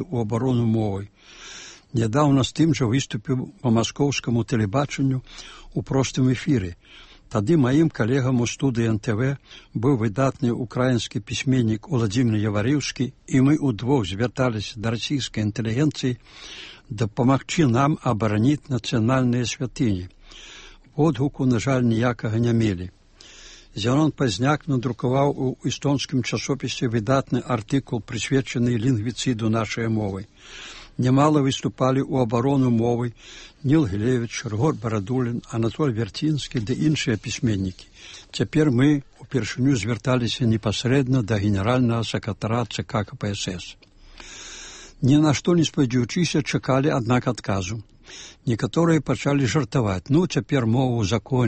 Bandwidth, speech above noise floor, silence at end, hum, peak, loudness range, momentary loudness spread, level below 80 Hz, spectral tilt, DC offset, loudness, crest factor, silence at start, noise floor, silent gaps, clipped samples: 8.8 kHz; 25 dB; 0 s; none; -6 dBFS; 3 LU; 14 LU; -48 dBFS; -6 dB/octave; under 0.1%; -23 LUFS; 16 dB; 0 s; -47 dBFS; none; under 0.1%